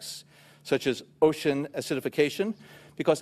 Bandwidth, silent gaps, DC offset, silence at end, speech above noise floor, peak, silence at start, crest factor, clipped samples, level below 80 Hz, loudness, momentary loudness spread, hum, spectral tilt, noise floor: 14.5 kHz; none; under 0.1%; 0 s; 25 dB; -8 dBFS; 0 s; 20 dB; under 0.1%; -66 dBFS; -28 LUFS; 18 LU; none; -5 dB/octave; -52 dBFS